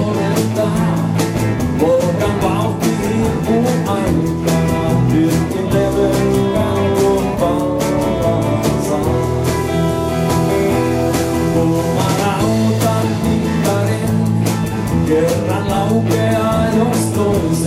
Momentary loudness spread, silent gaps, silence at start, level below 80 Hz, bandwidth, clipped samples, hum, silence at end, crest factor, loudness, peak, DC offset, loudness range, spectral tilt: 3 LU; none; 0 s; -32 dBFS; 16 kHz; under 0.1%; none; 0 s; 12 dB; -16 LUFS; -2 dBFS; under 0.1%; 1 LU; -6.5 dB/octave